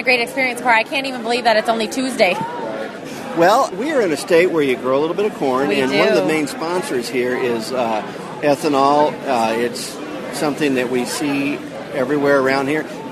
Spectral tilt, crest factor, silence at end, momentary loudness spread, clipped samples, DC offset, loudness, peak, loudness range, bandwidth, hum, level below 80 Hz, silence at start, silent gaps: -4 dB/octave; 16 dB; 0 s; 10 LU; under 0.1%; under 0.1%; -18 LUFS; 0 dBFS; 2 LU; 13.5 kHz; none; -60 dBFS; 0 s; none